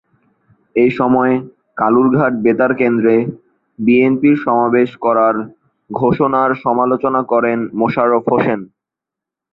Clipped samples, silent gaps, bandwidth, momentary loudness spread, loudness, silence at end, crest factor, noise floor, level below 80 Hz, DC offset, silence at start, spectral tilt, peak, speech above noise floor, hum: under 0.1%; none; 5.2 kHz; 8 LU; -14 LUFS; 0.9 s; 14 dB; -84 dBFS; -56 dBFS; under 0.1%; 0.75 s; -10 dB/octave; 0 dBFS; 71 dB; none